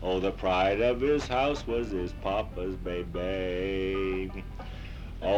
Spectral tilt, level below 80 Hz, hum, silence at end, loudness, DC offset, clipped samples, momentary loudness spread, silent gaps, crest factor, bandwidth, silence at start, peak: -6 dB/octave; -40 dBFS; none; 0 s; -30 LUFS; under 0.1%; under 0.1%; 15 LU; none; 16 dB; 11 kHz; 0 s; -14 dBFS